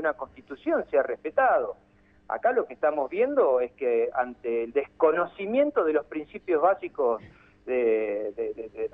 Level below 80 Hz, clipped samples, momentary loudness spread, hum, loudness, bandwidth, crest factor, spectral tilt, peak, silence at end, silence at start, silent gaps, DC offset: -64 dBFS; under 0.1%; 11 LU; none; -26 LUFS; 3.9 kHz; 18 dB; -8 dB/octave; -10 dBFS; 0.05 s; 0 s; none; under 0.1%